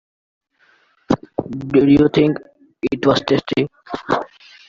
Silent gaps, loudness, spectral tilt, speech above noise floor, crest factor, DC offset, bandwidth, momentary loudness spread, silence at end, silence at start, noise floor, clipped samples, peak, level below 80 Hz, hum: none; -18 LUFS; -7 dB/octave; 41 dB; 16 dB; under 0.1%; 7.4 kHz; 14 LU; 0.45 s; 1.1 s; -57 dBFS; under 0.1%; -2 dBFS; -48 dBFS; none